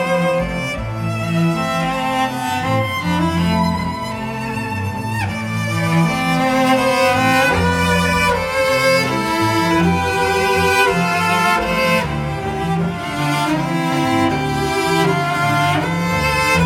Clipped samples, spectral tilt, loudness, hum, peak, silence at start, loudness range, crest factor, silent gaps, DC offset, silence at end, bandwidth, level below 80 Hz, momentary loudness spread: under 0.1%; -5 dB/octave; -17 LUFS; none; -2 dBFS; 0 s; 4 LU; 14 dB; none; under 0.1%; 0 s; 17 kHz; -38 dBFS; 8 LU